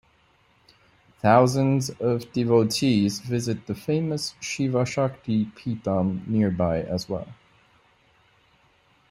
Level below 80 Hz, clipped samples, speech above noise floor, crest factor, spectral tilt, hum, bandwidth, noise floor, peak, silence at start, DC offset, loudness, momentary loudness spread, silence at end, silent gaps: -58 dBFS; under 0.1%; 38 dB; 22 dB; -6 dB/octave; none; 16 kHz; -62 dBFS; -4 dBFS; 1.25 s; under 0.1%; -24 LUFS; 10 LU; 1.8 s; none